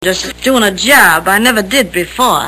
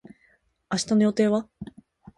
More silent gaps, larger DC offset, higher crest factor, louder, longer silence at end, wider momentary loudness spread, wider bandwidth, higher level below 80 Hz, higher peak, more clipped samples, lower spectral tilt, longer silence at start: neither; neither; second, 10 dB vs 18 dB; first, -9 LUFS vs -24 LUFS; second, 0 s vs 0.55 s; second, 9 LU vs 22 LU; first, over 20 kHz vs 11.5 kHz; first, -38 dBFS vs -60 dBFS; first, 0 dBFS vs -10 dBFS; first, 0.9% vs under 0.1%; second, -2.5 dB/octave vs -5.5 dB/octave; second, 0 s vs 0.7 s